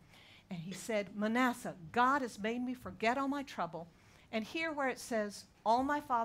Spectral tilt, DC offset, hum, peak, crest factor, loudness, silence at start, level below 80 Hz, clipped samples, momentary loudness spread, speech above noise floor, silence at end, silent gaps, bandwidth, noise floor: -4.5 dB/octave; under 0.1%; none; -18 dBFS; 18 dB; -36 LUFS; 0.15 s; -68 dBFS; under 0.1%; 12 LU; 25 dB; 0 s; none; 16 kHz; -60 dBFS